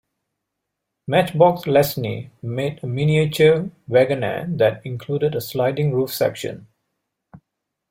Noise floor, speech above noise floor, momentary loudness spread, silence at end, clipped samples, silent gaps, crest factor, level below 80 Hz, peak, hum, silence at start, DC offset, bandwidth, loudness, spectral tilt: -80 dBFS; 61 dB; 14 LU; 0.55 s; under 0.1%; none; 18 dB; -56 dBFS; -2 dBFS; none; 1.1 s; under 0.1%; 16.5 kHz; -20 LUFS; -6.5 dB/octave